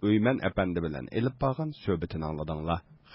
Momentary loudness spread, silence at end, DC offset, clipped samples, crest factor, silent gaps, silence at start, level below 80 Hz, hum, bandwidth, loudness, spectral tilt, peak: 8 LU; 0 s; under 0.1%; under 0.1%; 16 dB; none; 0 s; -46 dBFS; none; 5.8 kHz; -30 LUFS; -11.5 dB/octave; -14 dBFS